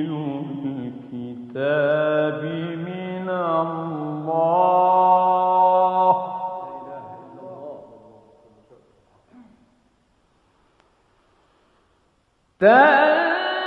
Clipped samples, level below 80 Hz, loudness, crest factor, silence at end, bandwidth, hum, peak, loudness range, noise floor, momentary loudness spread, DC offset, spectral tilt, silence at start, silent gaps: under 0.1%; -72 dBFS; -19 LUFS; 20 dB; 0 s; 5.6 kHz; none; -2 dBFS; 12 LU; -65 dBFS; 21 LU; under 0.1%; -8 dB/octave; 0 s; none